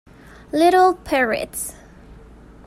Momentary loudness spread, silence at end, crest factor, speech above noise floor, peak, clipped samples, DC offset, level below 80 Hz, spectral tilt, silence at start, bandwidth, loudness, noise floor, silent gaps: 14 LU; 0.55 s; 16 dB; 26 dB; -4 dBFS; under 0.1%; under 0.1%; -48 dBFS; -3.5 dB/octave; 0.55 s; 15 kHz; -18 LUFS; -43 dBFS; none